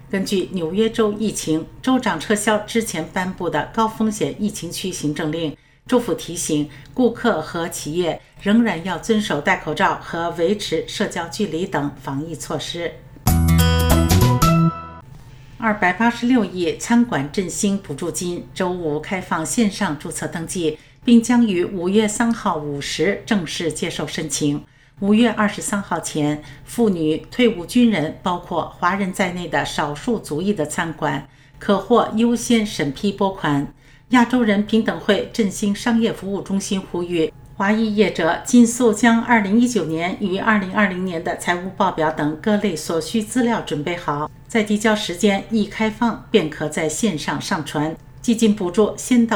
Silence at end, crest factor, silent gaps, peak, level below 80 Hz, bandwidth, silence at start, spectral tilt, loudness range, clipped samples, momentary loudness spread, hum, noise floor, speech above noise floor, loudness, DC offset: 0 s; 18 dB; none; 0 dBFS; -38 dBFS; 18.5 kHz; 0 s; -5 dB/octave; 5 LU; under 0.1%; 9 LU; none; -40 dBFS; 21 dB; -20 LUFS; under 0.1%